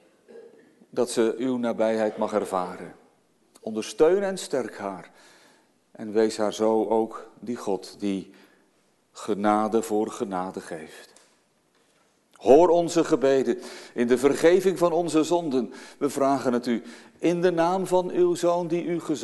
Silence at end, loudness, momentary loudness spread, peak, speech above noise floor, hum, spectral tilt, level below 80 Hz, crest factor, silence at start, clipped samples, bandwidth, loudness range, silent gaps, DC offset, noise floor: 0 s; -24 LUFS; 15 LU; -2 dBFS; 42 dB; none; -5.5 dB/octave; -64 dBFS; 22 dB; 0.3 s; under 0.1%; 12.5 kHz; 7 LU; none; under 0.1%; -66 dBFS